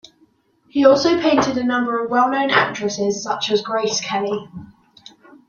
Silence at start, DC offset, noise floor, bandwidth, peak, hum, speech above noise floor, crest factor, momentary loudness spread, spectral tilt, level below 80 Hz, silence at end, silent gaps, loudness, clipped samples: 0.75 s; under 0.1%; -59 dBFS; 7.4 kHz; -2 dBFS; none; 41 dB; 18 dB; 11 LU; -3.5 dB/octave; -62 dBFS; 0.8 s; none; -18 LUFS; under 0.1%